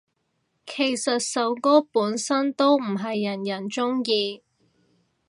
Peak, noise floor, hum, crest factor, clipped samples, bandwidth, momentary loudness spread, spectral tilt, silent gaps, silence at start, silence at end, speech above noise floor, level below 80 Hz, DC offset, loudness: -6 dBFS; -73 dBFS; none; 20 dB; under 0.1%; 11.5 kHz; 9 LU; -3.5 dB/octave; none; 0.65 s; 0.9 s; 50 dB; -78 dBFS; under 0.1%; -23 LUFS